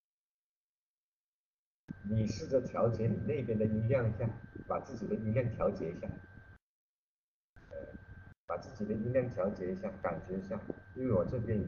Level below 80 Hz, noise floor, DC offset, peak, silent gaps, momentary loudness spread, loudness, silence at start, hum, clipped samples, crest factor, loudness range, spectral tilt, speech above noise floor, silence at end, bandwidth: -58 dBFS; under -90 dBFS; under 0.1%; -18 dBFS; 6.62-7.56 s, 8.37-8.48 s; 16 LU; -36 LUFS; 1.9 s; none; under 0.1%; 18 dB; 7 LU; -8.5 dB/octave; over 55 dB; 0 s; 7 kHz